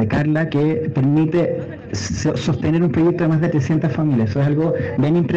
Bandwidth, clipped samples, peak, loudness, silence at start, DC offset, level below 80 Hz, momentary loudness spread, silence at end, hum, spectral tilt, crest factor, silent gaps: 7.8 kHz; under 0.1%; -6 dBFS; -18 LUFS; 0 s; under 0.1%; -44 dBFS; 5 LU; 0 s; none; -7.5 dB/octave; 12 dB; none